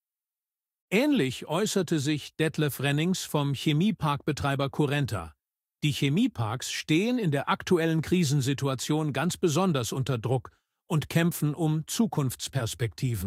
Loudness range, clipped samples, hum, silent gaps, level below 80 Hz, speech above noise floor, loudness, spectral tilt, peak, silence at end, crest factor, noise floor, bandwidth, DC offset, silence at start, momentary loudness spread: 2 LU; under 0.1%; none; none; -58 dBFS; over 63 dB; -27 LUFS; -5.5 dB/octave; -10 dBFS; 0 s; 18 dB; under -90 dBFS; 16 kHz; under 0.1%; 0.9 s; 6 LU